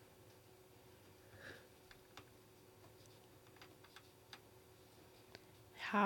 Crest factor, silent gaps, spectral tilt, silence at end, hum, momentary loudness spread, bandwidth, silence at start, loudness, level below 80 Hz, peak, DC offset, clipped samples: 28 dB; none; -5 dB/octave; 0 s; none; 7 LU; 18 kHz; 0 s; -57 LUFS; -80 dBFS; -22 dBFS; under 0.1%; under 0.1%